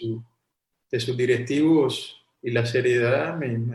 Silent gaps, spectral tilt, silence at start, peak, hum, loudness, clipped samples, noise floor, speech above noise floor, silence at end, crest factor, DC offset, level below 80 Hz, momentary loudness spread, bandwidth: none; -6.5 dB/octave; 0 s; -8 dBFS; none; -23 LUFS; under 0.1%; -79 dBFS; 57 dB; 0 s; 16 dB; under 0.1%; -68 dBFS; 13 LU; 12.5 kHz